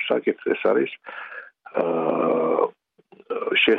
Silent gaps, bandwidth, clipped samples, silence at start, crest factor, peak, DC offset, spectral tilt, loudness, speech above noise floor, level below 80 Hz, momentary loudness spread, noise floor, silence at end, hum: none; 4.7 kHz; under 0.1%; 0 s; 16 dB; -6 dBFS; under 0.1%; -7 dB/octave; -23 LUFS; 32 dB; -72 dBFS; 15 LU; -54 dBFS; 0 s; none